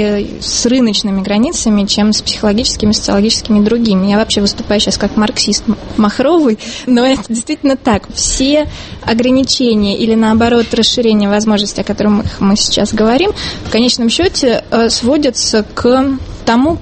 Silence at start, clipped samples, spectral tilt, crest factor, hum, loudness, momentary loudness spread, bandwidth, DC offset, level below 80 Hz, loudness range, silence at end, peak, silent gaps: 0 s; under 0.1%; -4 dB/octave; 12 dB; none; -12 LUFS; 4 LU; 8.8 kHz; under 0.1%; -32 dBFS; 1 LU; 0 s; 0 dBFS; none